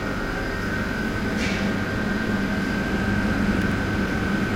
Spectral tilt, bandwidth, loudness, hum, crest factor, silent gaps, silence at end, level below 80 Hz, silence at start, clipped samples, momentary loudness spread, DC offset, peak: -6 dB/octave; 16 kHz; -24 LUFS; none; 14 dB; none; 0 s; -34 dBFS; 0 s; under 0.1%; 4 LU; under 0.1%; -10 dBFS